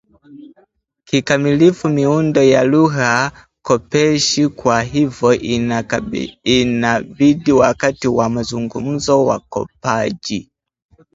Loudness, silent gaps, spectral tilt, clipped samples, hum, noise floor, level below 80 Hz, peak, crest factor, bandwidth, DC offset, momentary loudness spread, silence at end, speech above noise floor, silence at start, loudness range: -15 LUFS; none; -5 dB/octave; under 0.1%; none; -56 dBFS; -46 dBFS; 0 dBFS; 16 dB; 8 kHz; under 0.1%; 10 LU; 0.75 s; 41 dB; 0.3 s; 3 LU